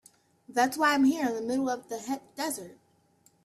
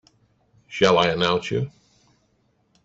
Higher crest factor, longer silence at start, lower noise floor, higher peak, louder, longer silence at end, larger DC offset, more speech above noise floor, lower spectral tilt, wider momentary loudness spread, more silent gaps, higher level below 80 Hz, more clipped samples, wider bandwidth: about the same, 18 dB vs 22 dB; second, 0.5 s vs 0.7 s; about the same, -66 dBFS vs -66 dBFS; second, -12 dBFS vs -2 dBFS; second, -29 LUFS vs -21 LUFS; second, 0.7 s vs 1.15 s; neither; second, 37 dB vs 46 dB; second, -3 dB/octave vs -5 dB/octave; second, 12 LU vs 15 LU; neither; second, -74 dBFS vs -58 dBFS; neither; first, 14 kHz vs 8 kHz